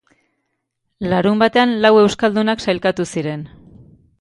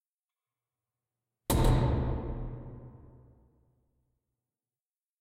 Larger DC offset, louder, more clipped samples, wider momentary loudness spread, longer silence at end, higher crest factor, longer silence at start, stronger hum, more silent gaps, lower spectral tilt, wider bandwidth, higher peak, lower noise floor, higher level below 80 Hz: neither; first, -16 LUFS vs -31 LUFS; neither; second, 14 LU vs 22 LU; second, 0.75 s vs 2.3 s; about the same, 18 dB vs 22 dB; second, 1 s vs 1.5 s; neither; neither; about the same, -5.5 dB/octave vs -6.5 dB/octave; second, 11.5 kHz vs 16 kHz; first, 0 dBFS vs -12 dBFS; second, -73 dBFS vs under -90 dBFS; second, -52 dBFS vs -38 dBFS